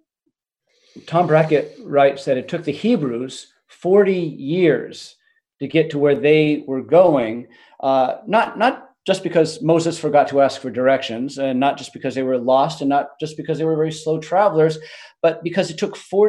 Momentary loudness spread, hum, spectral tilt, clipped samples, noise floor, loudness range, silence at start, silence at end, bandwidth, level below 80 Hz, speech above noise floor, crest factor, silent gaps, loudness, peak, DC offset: 11 LU; none; -6 dB/octave; under 0.1%; -74 dBFS; 3 LU; 0.95 s; 0 s; 11.5 kHz; -66 dBFS; 56 dB; 18 dB; none; -18 LUFS; -2 dBFS; under 0.1%